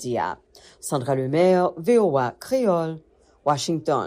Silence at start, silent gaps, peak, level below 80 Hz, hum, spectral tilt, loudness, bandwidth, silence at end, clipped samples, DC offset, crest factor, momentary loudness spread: 0 s; none; -8 dBFS; -62 dBFS; none; -6 dB/octave; -22 LUFS; 15.5 kHz; 0 s; under 0.1%; under 0.1%; 14 dB; 12 LU